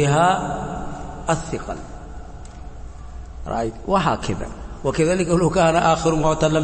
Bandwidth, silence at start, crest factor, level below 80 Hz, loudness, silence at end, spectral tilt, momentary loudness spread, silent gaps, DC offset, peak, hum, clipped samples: 8.8 kHz; 0 s; 16 dB; -36 dBFS; -21 LUFS; 0 s; -5.5 dB/octave; 22 LU; none; under 0.1%; -6 dBFS; none; under 0.1%